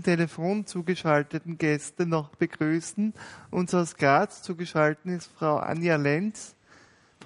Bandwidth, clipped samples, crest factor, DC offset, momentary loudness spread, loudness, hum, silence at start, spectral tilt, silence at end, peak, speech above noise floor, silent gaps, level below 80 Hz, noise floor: 11 kHz; under 0.1%; 20 dB; under 0.1%; 10 LU; -27 LUFS; none; 0 s; -6 dB/octave; 0 s; -6 dBFS; 31 dB; none; -68 dBFS; -57 dBFS